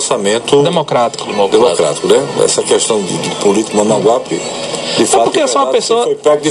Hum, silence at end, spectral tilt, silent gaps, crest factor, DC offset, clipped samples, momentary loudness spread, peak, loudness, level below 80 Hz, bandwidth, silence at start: none; 0 s; -3.5 dB/octave; none; 12 dB; under 0.1%; 0.1%; 5 LU; 0 dBFS; -12 LUFS; -54 dBFS; 12.5 kHz; 0 s